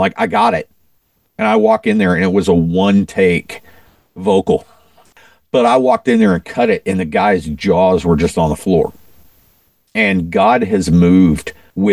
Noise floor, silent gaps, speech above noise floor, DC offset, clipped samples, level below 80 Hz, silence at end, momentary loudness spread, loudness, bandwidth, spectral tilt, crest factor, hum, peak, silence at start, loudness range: -59 dBFS; none; 46 dB; 0.2%; under 0.1%; -36 dBFS; 0 s; 8 LU; -14 LUFS; 15 kHz; -7 dB/octave; 14 dB; none; 0 dBFS; 0 s; 2 LU